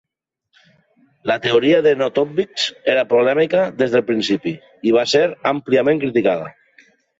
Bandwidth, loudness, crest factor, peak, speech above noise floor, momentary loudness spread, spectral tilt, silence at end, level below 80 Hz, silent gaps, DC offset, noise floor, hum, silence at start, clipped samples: 7.8 kHz; -17 LUFS; 14 dB; -4 dBFS; 58 dB; 8 LU; -5 dB/octave; 0.7 s; -62 dBFS; none; under 0.1%; -75 dBFS; none; 1.25 s; under 0.1%